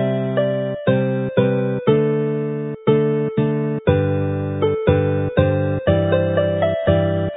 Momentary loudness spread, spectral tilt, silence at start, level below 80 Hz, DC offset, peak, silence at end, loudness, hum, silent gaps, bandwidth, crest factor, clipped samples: 4 LU; -13 dB/octave; 0 s; -36 dBFS; under 0.1%; 0 dBFS; 0 s; -19 LUFS; none; none; 4 kHz; 18 dB; under 0.1%